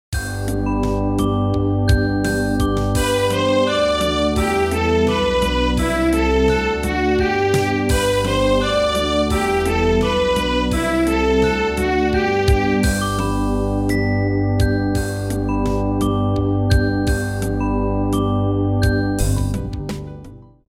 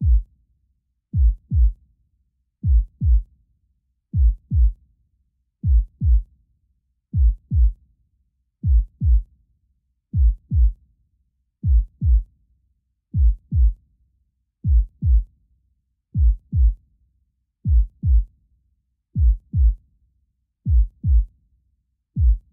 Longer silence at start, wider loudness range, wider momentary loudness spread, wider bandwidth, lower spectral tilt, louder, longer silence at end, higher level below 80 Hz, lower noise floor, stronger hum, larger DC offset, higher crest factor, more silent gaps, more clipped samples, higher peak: about the same, 0.1 s vs 0 s; about the same, 2 LU vs 0 LU; second, 5 LU vs 8 LU; first, 16.5 kHz vs 0.4 kHz; second, -6 dB/octave vs -15 dB/octave; first, -18 LUFS vs -22 LUFS; first, 0.3 s vs 0.15 s; about the same, -26 dBFS vs -22 dBFS; second, -39 dBFS vs -69 dBFS; neither; neither; about the same, 16 dB vs 12 dB; neither; neither; first, -2 dBFS vs -8 dBFS